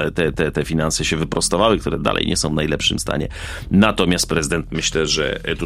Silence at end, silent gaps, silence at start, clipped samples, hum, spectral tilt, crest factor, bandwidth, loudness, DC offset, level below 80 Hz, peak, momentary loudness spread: 0 s; none; 0 s; under 0.1%; none; -4 dB/octave; 18 dB; 15.5 kHz; -19 LUFS; under 0.1%; -34 dBFS; 0 dBFS; 6 LU